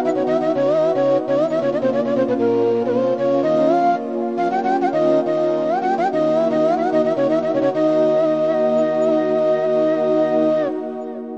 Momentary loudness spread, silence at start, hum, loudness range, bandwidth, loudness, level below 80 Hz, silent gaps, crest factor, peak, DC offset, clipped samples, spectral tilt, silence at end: 3 LU; 0 s; none; 1 LU; 7.6 kHz; -18 LUFS; -66 dBFS; none; 12 dB; -6 dBFS; 0.2%; under 0.1%; -7.5 dB/octave; 0 s